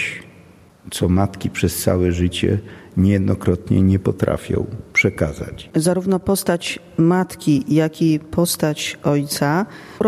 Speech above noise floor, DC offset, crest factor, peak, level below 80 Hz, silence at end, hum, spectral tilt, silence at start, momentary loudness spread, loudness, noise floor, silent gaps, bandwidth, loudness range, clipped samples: 28 dB; under 0.1%; 18 dB; -2 dBFS; -42 dBFS; 0 s; none; -5.5 dB/octave; 0 s; 7 LU; -19 LUFS; -47 dBFS; none; 14.5 kHz; 1 LU; under 0.1%